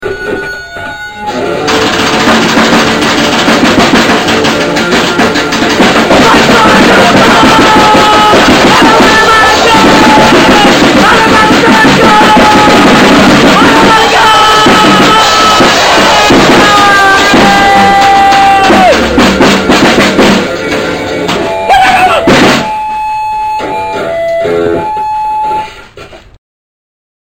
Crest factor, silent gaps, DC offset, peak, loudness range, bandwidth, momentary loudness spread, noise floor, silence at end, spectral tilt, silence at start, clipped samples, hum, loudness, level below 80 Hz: 6 dB; none; under 0.1%; 0 dBFS; 6 LU; over 20 kHz; 10 LU; -29 dBFS; 1.2 s; -3.5 dB/octave; 0 s; 6%; none; -4 LUFS; -28 dBFS